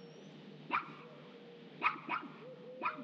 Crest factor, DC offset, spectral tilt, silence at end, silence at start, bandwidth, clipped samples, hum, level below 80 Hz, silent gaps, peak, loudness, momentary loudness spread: 26 dB; under 0.1%; -5.5 dB/octave; 0 s; 0 s; 7.8 kHz; under 0.1%; none; -80 dBFS; none; -16 dBFS; -39 LUFS; 18 LU